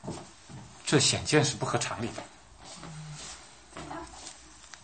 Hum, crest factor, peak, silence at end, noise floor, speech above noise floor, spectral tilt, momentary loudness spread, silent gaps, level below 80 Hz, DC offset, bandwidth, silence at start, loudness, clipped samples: none; 24 dB; -10 dBFS; 0.05 s; -51 dBFS; 24 dB; -3.5 dB/octave; 24 LU; none; -58 dBFS; under 0.1%; 8.8 kHz; 0 s; -28 LUFS; under 0.1%